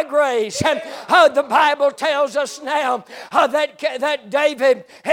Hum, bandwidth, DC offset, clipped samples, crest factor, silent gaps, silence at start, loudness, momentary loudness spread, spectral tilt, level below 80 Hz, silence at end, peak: none; 16.5 kHz; under 0.1%; under 0.1%; 14 dB; none; 0 s; -18 LUFS; 8 LU; -3 dB/octave; -58 dBFS; 0 s; -2 dBFS